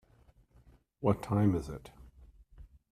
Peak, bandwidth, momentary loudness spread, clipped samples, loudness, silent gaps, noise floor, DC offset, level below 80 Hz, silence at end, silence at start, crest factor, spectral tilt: -12 dBFS; 14 kHz; 18 LU; under 0.1%; -32 LUFS; none; -64 dBFS; under 0.1%; -56 dBFS; 0.25 s; 1 s; 24 dB; -9 dB/octave